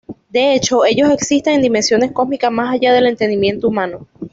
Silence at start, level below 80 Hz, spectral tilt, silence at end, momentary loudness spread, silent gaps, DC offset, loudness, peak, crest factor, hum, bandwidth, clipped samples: 0.1 s; -50 dBFS; -4 dB/octave; 0.05 s; 6 LU; none; under 0.1%; -14 LUFS; -2 dBFS; 12 dB; none; 8 kHz; under 0.1%